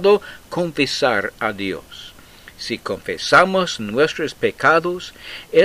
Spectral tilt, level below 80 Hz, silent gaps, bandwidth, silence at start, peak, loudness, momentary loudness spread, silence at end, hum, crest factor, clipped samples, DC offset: -4 dB/octave; -52 dBFS; none; 15.5 kHz; 0 s; 0 dBFS; -19 LUFS; 17 LU; 0 s; none; 18 dB; under 0.1%; under 0.1%